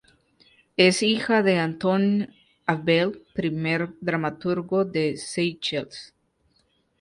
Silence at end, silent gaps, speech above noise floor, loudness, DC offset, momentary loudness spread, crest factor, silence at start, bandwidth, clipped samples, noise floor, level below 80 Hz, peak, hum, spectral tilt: 0.95 s; none; 44 dB; -24 LUFS; under 0.1%; 10 LU; 20 dB; 0.8 s; 11.5 kHz; under 0.1%; -67 dBFS; -64 dBFS; -4 dBFS; none; -5 dB/octave